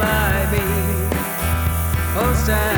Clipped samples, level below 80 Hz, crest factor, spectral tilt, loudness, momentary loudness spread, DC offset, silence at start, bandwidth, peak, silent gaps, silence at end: under 0.1%; -24 dBFS; 14 dB; -5 dB/octave; -19 LUFS; 3 LU; under 0.1%; 0 s; over 20 kHz; -4 dBFS; none; 0 s